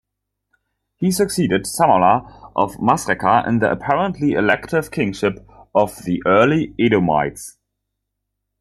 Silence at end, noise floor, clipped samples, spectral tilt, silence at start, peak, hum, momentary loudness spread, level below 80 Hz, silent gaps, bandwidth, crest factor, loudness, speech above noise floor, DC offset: 1.1 s; -78 dBFS; under 0.1%; -5.5 dB/octave; 1 s; -2 dBFS; 50 Hz at -45 dBFS; 8 LU; -50 dBFS; none; 13.5 kHz; 18 dB; -18 LUFS; 61 dB; under 0.1%